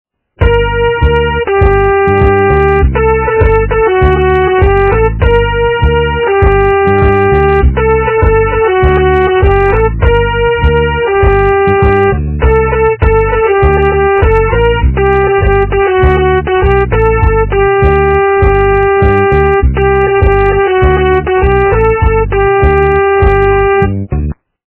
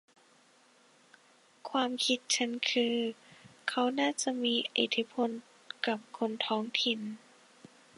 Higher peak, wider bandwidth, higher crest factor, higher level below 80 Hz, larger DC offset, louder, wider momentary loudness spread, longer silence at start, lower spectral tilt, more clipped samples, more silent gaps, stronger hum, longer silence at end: first, 0 dBFS vs -12 dBFS; second, 4 kHz vs 11.5 kHz; second, 8 dB vs 22 dB; first, -14 dBFS vs -86 dBFS; neither; first, -9 LUFS vs -32 LUFS; second, 2 LU vs 11 LU; second, 0.4 s vs 1.65 s; first, -11 dB/octave vs -2 dB/octave; first, 0.7% vs under 0.1%; neither; neither; second, 0.35 s vs 0.8 s